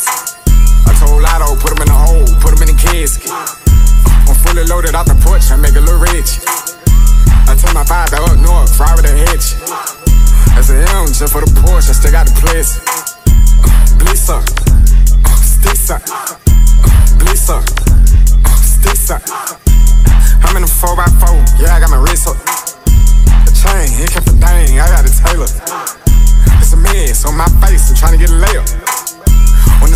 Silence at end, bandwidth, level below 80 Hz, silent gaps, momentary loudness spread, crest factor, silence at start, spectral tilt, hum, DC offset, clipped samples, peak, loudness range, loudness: 0 s; 16 kHz; -6 dBFS; none; 6 LU; 6 dB; 0 s; -4.5 dB/octave; none; under 0.1%; 1%; 0 dBFS; 0 LU; -10 LUFS